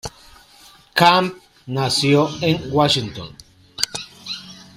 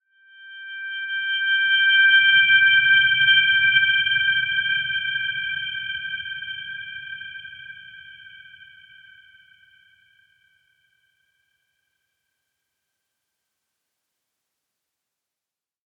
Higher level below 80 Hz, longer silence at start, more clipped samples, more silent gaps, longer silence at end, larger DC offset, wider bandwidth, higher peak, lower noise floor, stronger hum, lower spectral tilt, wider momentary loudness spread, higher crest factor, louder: first, -52 dBFS vs -72 dBFS; second, 0.05 s vs 0.4 s; neither; neither; second, 0.15 s vs 7.55 s; neither; first, 16 kHz vs 3.5 kHz; first, 0 dBFS vs -4 dBFS; second, -48 dBFS vs -89 dBFS; neither; first, -4.5 dB/octave vs -2 dB/octave; second, 18 LU vs 22 LU; about the same, 20 dB vs 20 dB; about the same, -18 LUFS vs -17 LUFS